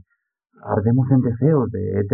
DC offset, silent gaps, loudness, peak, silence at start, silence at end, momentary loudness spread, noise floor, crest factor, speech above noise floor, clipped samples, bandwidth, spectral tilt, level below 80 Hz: under 0.1%; none; -19 LUFS; -4 dBFS; 0.65 s; 0 s; 7 LU; -72 dBFS; 16 dB; 54 dB; under 0.1%; 2.2 kHz; -14 dB/octave; -62 dBFS